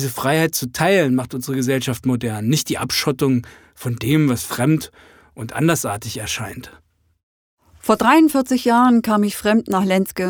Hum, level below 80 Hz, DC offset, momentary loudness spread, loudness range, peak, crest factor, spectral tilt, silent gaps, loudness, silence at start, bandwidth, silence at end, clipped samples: none; -52 dBFS; under 0.1%; 12 LU; 6 LU; -2 dBFS; 18 dB; -5 dB/octave; 7.23-7.57 s; -18 LUFS; 0 s; over 20 kHz; 0 s; under 0.1%